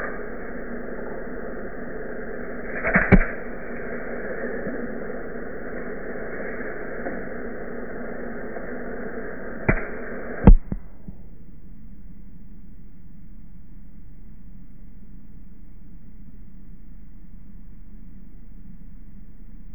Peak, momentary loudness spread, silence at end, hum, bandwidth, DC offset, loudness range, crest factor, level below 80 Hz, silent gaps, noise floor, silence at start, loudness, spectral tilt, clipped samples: -2 dBFS; 26 LU; 0.05 s; none; 3.2 kHz; 3%; 23 LU; 24 dB; -30 dBFS; none; -45 dBFS; 0 s; -27 LUFS; -11.5 dB/octave; under 0.1%